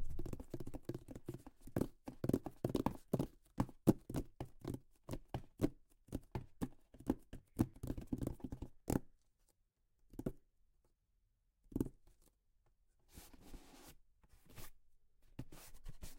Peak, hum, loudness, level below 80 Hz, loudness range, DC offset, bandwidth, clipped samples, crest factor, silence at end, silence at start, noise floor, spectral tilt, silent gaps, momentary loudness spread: -16 dBFS; none; -45 LUFS; -56 dBFS; 13 LU; under 0.1%; 16.5 kHz; under 0.1%; 28 dB; 0 s; 0 s; -80 dBFS; -7.5 dB/octave; none; 18 LU